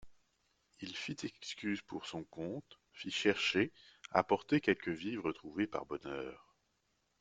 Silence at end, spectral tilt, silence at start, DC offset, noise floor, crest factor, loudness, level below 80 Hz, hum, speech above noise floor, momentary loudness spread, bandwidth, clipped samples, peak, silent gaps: 0.85 s; -4.5 dB/octave; 0 s; under 0.1%; -80 dBFS; 26 dB; -37 LUFS; -72 dBFS; none; 42 dB; 13 LU; 9.2 kHz; under 0.1%; -12 dBFS; none